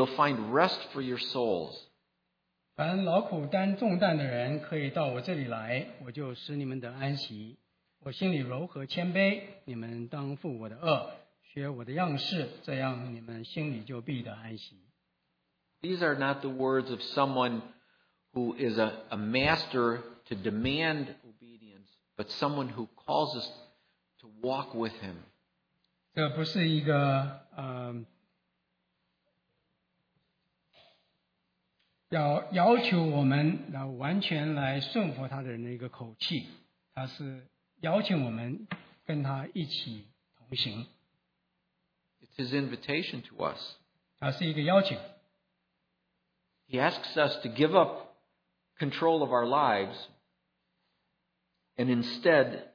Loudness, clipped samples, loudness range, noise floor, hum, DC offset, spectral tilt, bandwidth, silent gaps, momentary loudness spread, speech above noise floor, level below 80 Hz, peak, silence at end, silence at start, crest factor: -31 LUFS; under 0.1%; 8 LU; -80 dBFS; none; under 0.1%; -7.5 dB/octave; 5.4 kHz; none; 16 LU; 49 dB; -68 dBFS; -8 dBFS; 0.05 s; 0 s; 24 dB